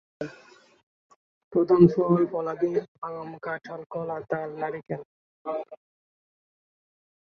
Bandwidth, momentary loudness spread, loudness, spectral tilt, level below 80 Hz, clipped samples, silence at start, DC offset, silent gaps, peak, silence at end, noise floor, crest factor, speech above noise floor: 6.4 kHz; 19 LU; -26 LUFS; -10 dB/octave; -64 dBFS; under 0.1%; 0.2 s; under 0.1%; 0.83-1.10 s, 1.16-1.51 s, 2.88-2.95 s, 3.86-3.90 s, 5.05-5.45 s; -4 dBFS; 1.55 s; -54 dBFS; 24 dB; 29 dB